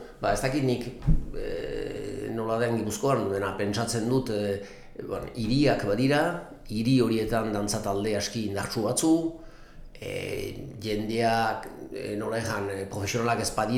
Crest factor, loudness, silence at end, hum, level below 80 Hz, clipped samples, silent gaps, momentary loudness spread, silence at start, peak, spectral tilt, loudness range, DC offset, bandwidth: 18 dB; -28 LUFS; 0 s; none; -40 dBFS; under 0.1%; none; 12 LU; 0 s; -10 dBFS; -5 dB/octave; 4 LU; under 0.1%; 18 kHz